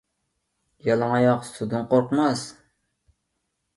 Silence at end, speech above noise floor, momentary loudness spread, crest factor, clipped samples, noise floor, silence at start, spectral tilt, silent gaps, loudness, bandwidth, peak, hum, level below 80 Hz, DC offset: 1.25 s; 55 dB; 10 LU; 18 dB; under 0.1%; -77 dBFS; 0.85 s; -6.5 dB/octave; none; -23 LUFS; 11.5 kHz; -6 dBFS; none; -64 dBFS; under 0.1%